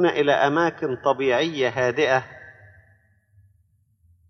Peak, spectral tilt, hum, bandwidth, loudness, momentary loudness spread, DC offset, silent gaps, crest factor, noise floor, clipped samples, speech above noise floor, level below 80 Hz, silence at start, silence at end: -6 dBFS; -5 dB/octave; none; 6.6 kHz; -21 LUFS; 6 LU; under 0.1%; none; 18 dB; -63 dBFS; under 0.1%; 42 dB; -64 dBFS; 0 s; 1.8 s